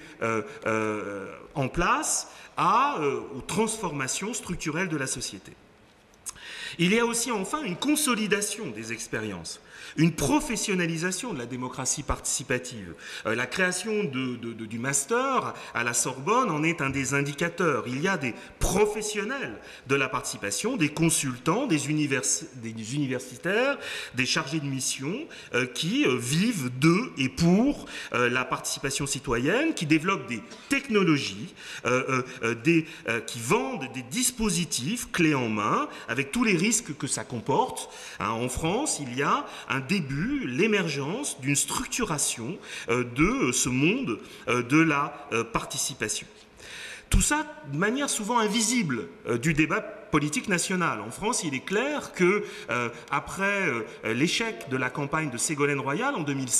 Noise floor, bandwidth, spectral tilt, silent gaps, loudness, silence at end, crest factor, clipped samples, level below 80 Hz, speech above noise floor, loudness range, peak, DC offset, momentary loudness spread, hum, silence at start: -56 dBFS; 15 kHz; -4 dB/octave; none; -27 LUFS; 0 s; 18 dB; under 0.1%; -46 dBFS; 29 dB; 3 LU; -8 dBFS; under 0.1%; 10 LU; none; 0 s